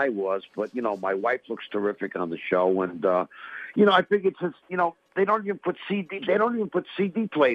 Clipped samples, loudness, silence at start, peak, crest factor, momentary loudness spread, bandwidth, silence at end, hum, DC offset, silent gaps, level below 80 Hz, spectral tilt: under 0.1%; -26 LUFS; 0 s; -6 dBFS; 20 dB; 9 LU; 6 kHz; 0 s; none; under 0.1%; none; -74 dBFS; -7.5 dB/octave